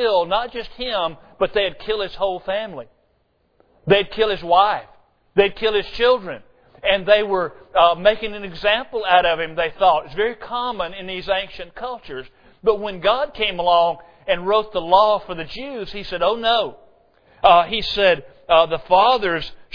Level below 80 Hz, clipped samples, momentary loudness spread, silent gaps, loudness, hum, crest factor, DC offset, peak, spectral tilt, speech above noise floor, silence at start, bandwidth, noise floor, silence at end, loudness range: -44 dBFS; under 0.1%; 14 LU; none; -19 LUFS; none; 20 dB; under 0.1%; 0 dBFS; -5.5 dB/octave; 45 dB; 0 s; 5.4 kHz; -64 dBFS; 0 s; 5 LU